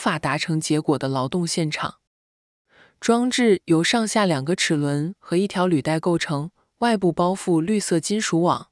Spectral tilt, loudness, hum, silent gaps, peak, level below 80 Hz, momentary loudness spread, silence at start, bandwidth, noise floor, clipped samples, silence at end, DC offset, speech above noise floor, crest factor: -5 dB/octave; -22 LUFS; none; 2.07-2.65 s; -6 dBFS; -62 dBFS; 6 LU; 0 s; 12 kHz; under -90 dBFS; under 0.1%; 0.1 s; under 0.1%; over 69 dB; 16 dB